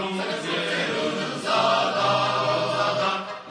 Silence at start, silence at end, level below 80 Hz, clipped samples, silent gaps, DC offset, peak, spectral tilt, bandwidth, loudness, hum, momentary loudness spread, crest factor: 0 s; 0 s; -68 dBFS; under 0.1%; none; under 0.1%; -10 dBFS; -4 dB/octave; 10.5 kHz; -23 LUFS; none; 6 LU; 14 dB